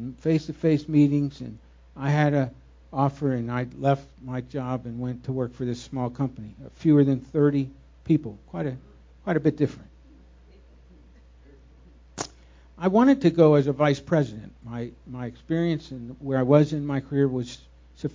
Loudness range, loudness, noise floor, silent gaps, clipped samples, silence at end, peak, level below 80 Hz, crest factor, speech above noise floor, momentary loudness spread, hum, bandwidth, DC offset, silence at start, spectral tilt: 8 LU; -25 LUFS; -52 dBFS; none; under 0.1%; 0.05 s; -4 dBFS; -52 dBFS; 22 dB; 28 dB; 17 LU; none; 7.6 kHz; under 0.1%; 0 s; -8 dB/octave